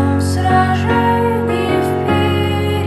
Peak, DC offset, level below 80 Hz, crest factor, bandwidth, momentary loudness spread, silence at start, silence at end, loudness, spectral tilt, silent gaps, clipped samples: -2 dBFS; under 0.1%; -38 dBFS; 14 dB; 13 kHz; 3 LU; 0 s; 0 s; -15 LUFS; -6.5 dB/octave; none; under 0.1%